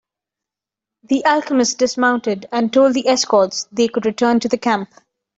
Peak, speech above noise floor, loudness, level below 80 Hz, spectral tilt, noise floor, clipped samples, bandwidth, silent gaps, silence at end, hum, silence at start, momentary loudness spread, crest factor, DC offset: -2 dBFS; 70 dB; -17 LUFS; -62 dBFS; -3 dB/octave; -86 dBFS; under 0.1%; 8 kHz; none; 0.5 s; none; 1.1 s; 7 LU; 16 dB; under 0.1%